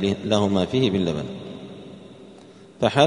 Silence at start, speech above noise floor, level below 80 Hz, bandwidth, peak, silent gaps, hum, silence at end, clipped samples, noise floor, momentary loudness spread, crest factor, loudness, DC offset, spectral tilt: 0 s; 26 dB; -54 dBFS; 10.5 kHz; -2 dBFS; none; none; 0 s; under 0.1%; -46 dBFS; 22 LU; 22 dB; -23 LUFS; under 0.1%; -6 dB/octave